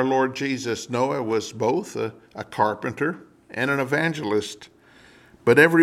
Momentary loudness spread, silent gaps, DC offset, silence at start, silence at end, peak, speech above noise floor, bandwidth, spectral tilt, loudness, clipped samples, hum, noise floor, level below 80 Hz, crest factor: 14 LU; none; under 0.1%; 0 s; 0 s; -2 dBFS; 30 dB; 15 kHz; -5.5 dB/octave; -24 LUFS; under 0.1%; none; -52 dBFS; -66 dBFS; 20 dB